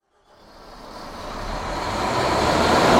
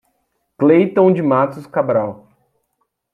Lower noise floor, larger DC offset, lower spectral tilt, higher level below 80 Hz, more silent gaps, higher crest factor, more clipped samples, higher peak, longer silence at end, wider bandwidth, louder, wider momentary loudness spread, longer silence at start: second, -53 dBFS vs -70 dBFS; neither; second, -4.5 dB/octave vs -9.5 dB/octave; first, -38 dBFS vs -64 dBFS; neither; about the same, 20 dB vs 16 dB; neither; about the same, -2 dBFS vs -2 dBFS; second, 0 s vs 1 s; first, 16.5 kHz vs 4.8 kHz; second, -22 LUFS vs -15 LUFS; first, 22 LU vs 8 LU; about the same, 0.55 s vs 0.6 s